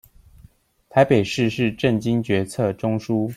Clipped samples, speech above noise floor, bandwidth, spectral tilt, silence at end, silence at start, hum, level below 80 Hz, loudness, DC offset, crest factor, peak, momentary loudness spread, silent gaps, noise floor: under 0.1%; 33 dB; 15 kHz; -6.5 dB/octave; 0 s; 0.95 s; none; -52 dBFS; -21 LUFS; under 0.1%; 18 dB; -4 dBFS; 6 LU; none; -53 dBFS